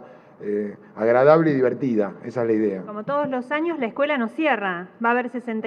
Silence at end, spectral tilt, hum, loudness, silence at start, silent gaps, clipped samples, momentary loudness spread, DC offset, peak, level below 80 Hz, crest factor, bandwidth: 0 s; -8 dB/octave; none; -22 LUFS; 0 s; none; under 0.1%; 11 LU; under 0.1%; -2 dBFS; -74 dBFS; 20 dB; 6.8 kHz